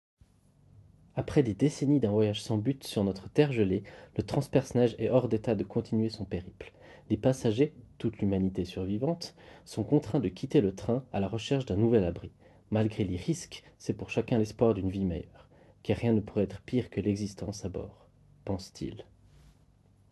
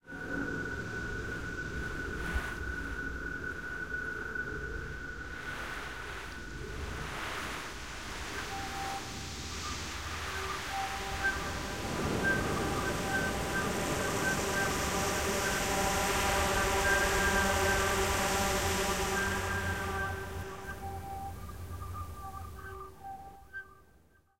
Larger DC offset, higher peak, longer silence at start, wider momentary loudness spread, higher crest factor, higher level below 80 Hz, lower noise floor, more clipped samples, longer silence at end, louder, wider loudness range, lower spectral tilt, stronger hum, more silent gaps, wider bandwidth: second, under 0.1% vs 0.2%; first, -8 dBFS vs -14 dBFS; first, 1.15 s vs 0 s; about the same, 14 LU vs 14 LU; about the same, 22 dB vs 20 dB; second, -52 dBFS vs -44 dBFS; about the same, -63 dBFS vs -64 dBFS; neither; first, 1.1 s vs 0 s; about the same, -31 LUFS vs -33 LUFS; second, 4 LU vs 11 LU; first, -7 dB/octave vs -3.5 dB/octave; neither; neither; second, 12.5 kHz vs 16 kHz